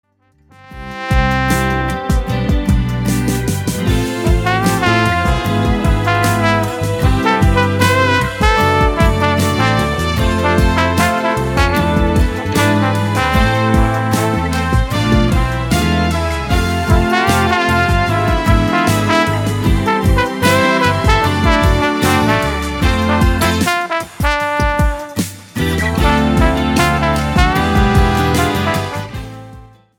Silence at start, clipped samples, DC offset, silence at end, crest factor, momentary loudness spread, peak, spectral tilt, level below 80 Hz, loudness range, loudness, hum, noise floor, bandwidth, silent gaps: 0.7 s; under 0.1%; under 0.1%; 0.35 s; 14 dB; 5 LU; 0 dBFS; -5.5 dB/octave; -20 dBFS; 3 LU; -14 LUFS; none; -52 dBFS; 19 kHz; none